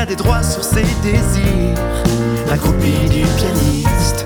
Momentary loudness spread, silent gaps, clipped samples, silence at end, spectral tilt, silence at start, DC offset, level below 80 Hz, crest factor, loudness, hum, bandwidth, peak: 2 LU; none; under 0.1%; 0 s; -5.5 dB/octave; 0 s; under 0.1%; -20 dBFS; 12 dB; -15 LUFS; none; over 20 kHz; -2 dBFS